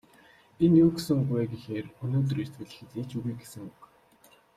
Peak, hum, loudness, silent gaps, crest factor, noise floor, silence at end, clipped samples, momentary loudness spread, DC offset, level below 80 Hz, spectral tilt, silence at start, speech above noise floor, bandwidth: -10 dBFS; none; -28 LUFS; none; 18 dB; -60 dBFS; 0.7 s; under 0.1%; 22 LU; under 0.1%; -60 dBFS; -8 dB/octave; 0.6 s; 33 dB; 14.5 kHz